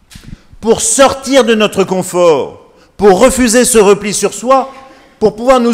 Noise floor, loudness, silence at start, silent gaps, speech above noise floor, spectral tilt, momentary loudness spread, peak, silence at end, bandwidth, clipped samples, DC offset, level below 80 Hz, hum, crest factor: -33 dBFS; -10 LUFS; 0.15 s; none; 24 dB; -3.5 dB/octave; 8 LU; 0 dBFS; 0 s; 16.5 kHz; 1%; under 0.1%; -36 dBFS; none; 10 dB